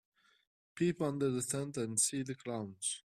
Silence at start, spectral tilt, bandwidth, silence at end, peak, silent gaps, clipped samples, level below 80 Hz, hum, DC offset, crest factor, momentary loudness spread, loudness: 0.75 s; -4 dB/octave; 15 kHz; 0.1 s; -18 dBFS; none; under 0.1%; -74 dBFS; none; under 0.1%; 20 dB; 9 LU; -35 LUFS